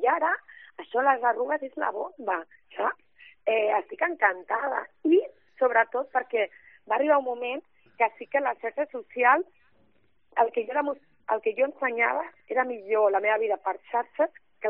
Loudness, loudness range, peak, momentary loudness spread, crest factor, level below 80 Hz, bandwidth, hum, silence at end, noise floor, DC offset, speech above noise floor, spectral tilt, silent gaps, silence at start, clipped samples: -27 LUFS; 2 LU; -6 dBFS; 10 LU; 20 dB; -80 dBFS; 3.8 kHz; none; 0 s; -69 dBFS; under 0.1%; 43 dB; -0.5 dB/octave; none; 0 s; under 0.1%